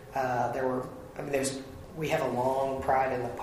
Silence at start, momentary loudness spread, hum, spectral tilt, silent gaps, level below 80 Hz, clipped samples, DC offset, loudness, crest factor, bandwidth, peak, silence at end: 0 s; 13 LU; none; -5 dB/octave; none; -54 dBFS; under 0.1%; under 0.1%; -30 LUFS; 18 dB; 15.5 kHz; -12 dBFS; 0 s